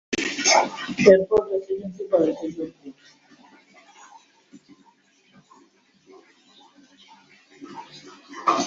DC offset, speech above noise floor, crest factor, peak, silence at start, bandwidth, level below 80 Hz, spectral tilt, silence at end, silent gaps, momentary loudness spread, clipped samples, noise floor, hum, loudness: under 0.1%; 38 dB; 24 dB; 0 dBFS; 0.1 s; 7.8 kHz; -62 dBFS; -3 dB/octave; 0 s; none; 26 LU; under 0.1%; -60 dBFS; none; -21 LUFS